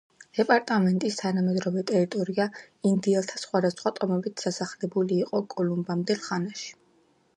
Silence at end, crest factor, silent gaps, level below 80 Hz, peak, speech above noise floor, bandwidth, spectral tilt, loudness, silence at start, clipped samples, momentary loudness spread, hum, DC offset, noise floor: 0.65 s; 20 dB; none; -74 dBFS; -6 dBFS; 38 dB; 10.5 kHz; -6 dB/octave; -27 LUFS; 0.35 s; under 0.1%; 8 LU; none; under 0.1%; -64 dBFS